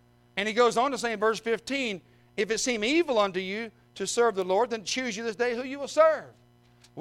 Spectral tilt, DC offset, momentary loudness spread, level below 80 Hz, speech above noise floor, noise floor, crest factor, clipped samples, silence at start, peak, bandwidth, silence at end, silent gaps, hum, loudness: -3 dB/octave; under 0.1%; 11 LU; -66 dBFS; 32 dB; -59 dBFS; 20 dB; under 0.1%; 0.35 s; -8 dBFS; 13.5 kHz; 0 s; none; none; -27 LUFS